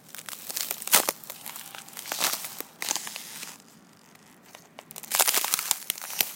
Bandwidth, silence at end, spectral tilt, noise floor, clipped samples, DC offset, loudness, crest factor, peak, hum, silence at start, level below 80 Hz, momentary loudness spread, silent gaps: 17 kHz; 0 s; 1 dB/octave; -54 dBFS; under 0.1%; under 0.1%; -26 LUFS; 30 dB; 0 dBFS; none; 0.05 s; -78 dBFS; 18 LU; none